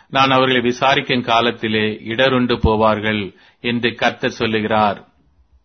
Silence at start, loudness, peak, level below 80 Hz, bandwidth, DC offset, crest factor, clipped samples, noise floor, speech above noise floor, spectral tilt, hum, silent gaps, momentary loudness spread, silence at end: 0.1 s; -17 LUFS; 0 dBFS; -36 dBFS; 6.6 kHz; under 0.1%; 18 dB; under 0.1%; -55 dBFS; 38 dB; -5.5 dB/octave; none; none; 7 LU; 0.6 s